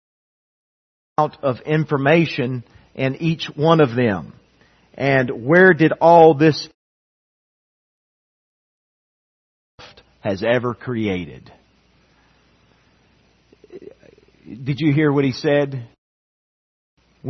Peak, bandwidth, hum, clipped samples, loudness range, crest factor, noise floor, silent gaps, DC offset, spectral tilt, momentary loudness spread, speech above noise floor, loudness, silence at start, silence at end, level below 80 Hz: 0 dBFS; 6.4 kHz; none; under 0.1%; 13 LU; 20 dB; -58 dBFS; 6.74-9.78 s, 15.98-16.97 s; under 0.1%; -7.5 dB/octave; 16 LU; 41 dB; -17 LUFS; 1.2 s; 0 s; -60 dBFS